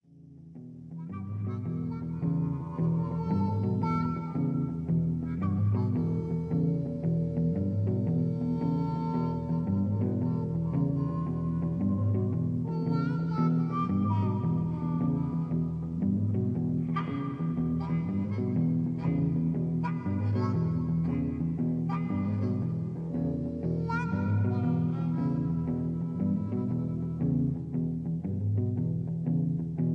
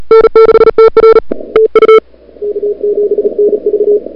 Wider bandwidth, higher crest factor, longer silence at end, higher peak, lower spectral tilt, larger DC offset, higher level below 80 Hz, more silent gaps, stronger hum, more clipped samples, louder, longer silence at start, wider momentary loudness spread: about the same, 5 kHz vs 5.2 kHz; about the same, 12 dB vs 8 dB; about the same, 0 s vs 0.05 s; second, -16 dBFS vs 0 dBFS; first, -11 dB/octave vs -6.5 dB/octave; neither; second, -52 dBFS vs -36 dBFS; neither; neither; second, under 0.1% vs 3%; second, -30 LUFS vs -7 LUFS; first, 0.15 s vs 0 s; second, 4 LU vs 10 LU